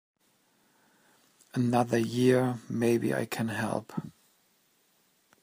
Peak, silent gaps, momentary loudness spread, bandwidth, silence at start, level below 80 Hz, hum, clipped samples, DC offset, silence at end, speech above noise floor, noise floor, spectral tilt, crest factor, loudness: -10 dBFS; none; 13 LU; 15.5 kHz; 1.55 s; -72 dBFS; none; under 0.1%; under 0.1%; 1.3 s; 41 dB; -69 dBFS; -6.5 dB/octave; 20 dB; -29 LUFS